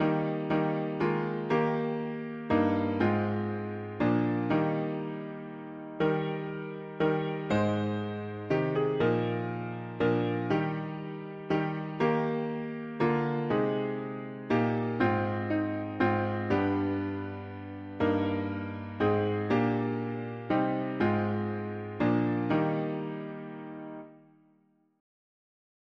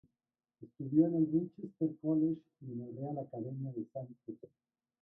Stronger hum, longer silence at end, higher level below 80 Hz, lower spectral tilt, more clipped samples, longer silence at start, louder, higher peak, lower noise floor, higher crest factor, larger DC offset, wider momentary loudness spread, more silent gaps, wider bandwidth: neither; first, 1.8 s vs 0.55 s; first, -62 dBFS vs -78 dBFS; second, -9 dB/octave vs -14 dB/octave; neither; second, 0 s vs 0.6 s; first, -30 LUFS vs -36 LUFS; about the same, -14 dBFS vs -16 dBFS; second, -68 dBFS vs under -90 dBFS; about the same, 16 dB vs 20 dB; neither; second, 11 LU vs 17 LU; neither; first, 7.4 kHz vs 1.6 kHz